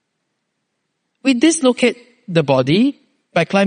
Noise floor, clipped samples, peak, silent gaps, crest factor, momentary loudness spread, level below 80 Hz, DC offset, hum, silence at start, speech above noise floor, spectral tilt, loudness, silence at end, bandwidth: -73 dBFS; under 0.1%; 0 dBFS; none; 16 dB; 7 LU; -62 dBFS; under 0.1%; none; 1.25 s; 58 dB; -5 dB/octave; -16 LUFS; 0 s; 10 kHz